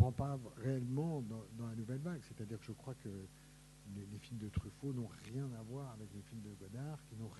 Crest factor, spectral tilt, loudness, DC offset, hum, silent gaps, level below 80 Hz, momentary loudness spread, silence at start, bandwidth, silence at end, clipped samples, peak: 26 dB; -7.5 dB/octave; -45 LUFS; under 0.1%; none; none; -62 dBFS; 12 LU; 0 s; 12 kHz; 0 s; under 0.1%; -18 dBFS